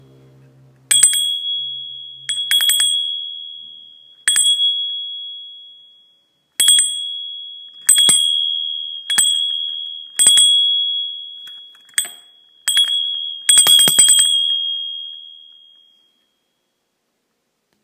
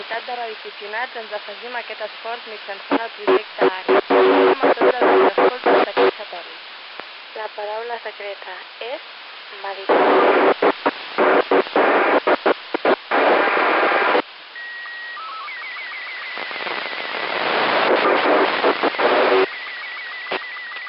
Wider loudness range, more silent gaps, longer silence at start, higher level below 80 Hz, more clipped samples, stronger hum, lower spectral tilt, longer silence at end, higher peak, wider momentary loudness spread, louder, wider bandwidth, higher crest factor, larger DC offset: second, 6 LU vs 9 LU; neither; first, 0.9 s vs 0 s; about the same, -70 dBFS vs -74 dBFS; neither; neither; second, 3 dB/octave vs -7.5 dB/octave; first, 2.5 s vs 0 s; first, 0 dBFS vs -4 dBFS; first, 21 LU vs 16 LU; first, -13 LUFS vs -19 LUFS; first, 16 kHz vs 5.8 kHz; about the same, 18 dB vs 16 dB; neither